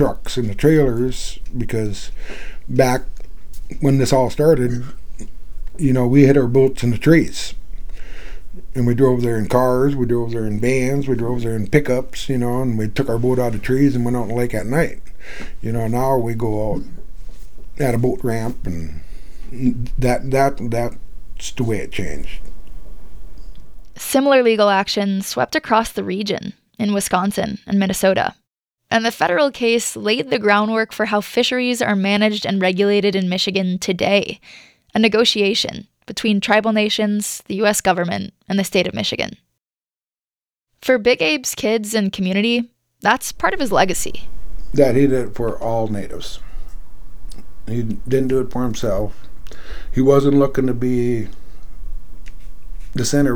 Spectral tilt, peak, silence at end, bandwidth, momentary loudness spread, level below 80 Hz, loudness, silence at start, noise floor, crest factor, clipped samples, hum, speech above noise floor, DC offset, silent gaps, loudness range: -5 dB/octave; 0 dBFS; 0 s; 19 kHz; 16 LU; -32 dBFS; -18 LUFS; 0 s; under -90 dBFS; 18 dB; under 0.1%; none; over 73 dB; under 0.1%; 39.97-40.01 s; 6 LU